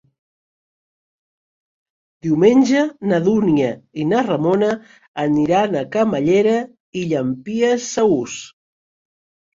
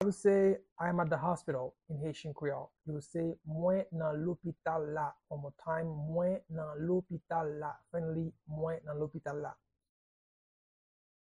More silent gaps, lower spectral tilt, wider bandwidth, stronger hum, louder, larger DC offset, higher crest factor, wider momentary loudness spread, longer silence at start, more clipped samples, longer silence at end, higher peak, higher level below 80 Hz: first, 5.08-5.14 s, 6.80-6.93 s vs 0.72-0.76 s; second, -6 dB/octave vs -8 dB/octave; second, 7.8 kHz vs 11 kHz; neither; first, -18 LUFS vs -36 LUFS; neither; about the same, 18 dB vs 20 dB; about the same, 11 LU vs 10 LU; first, 2.25 s vs 0 s; neither; second, 1.1 s vs 1.7 s; first, 0 dBFS vs -18 dBFS; first, -58 dBFS vs -68 dBFS